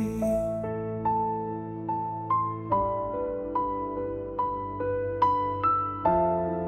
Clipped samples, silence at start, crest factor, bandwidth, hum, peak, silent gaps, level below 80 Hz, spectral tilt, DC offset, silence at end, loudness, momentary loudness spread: under 0.1%; 0 s; 18 dB; 15 kHz; none; -10 dBFS; none; -50 dBFS; -8.5 dB/octave; under 0.1%; 0 s; -28 LUFS; 7 LU